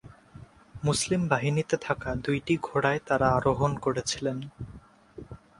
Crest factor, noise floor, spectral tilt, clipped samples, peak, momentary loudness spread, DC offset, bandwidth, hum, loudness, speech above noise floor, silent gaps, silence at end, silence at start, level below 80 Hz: 20 dB; -50 dBFS; -5 dB/octave; under 0.1%; -8 dBFS; 18 LU; under 0.1%; 11.5 kHz; none; -27 LUFS; 23 dB; none; 0.25 s; 0.05 s; -50 dBFS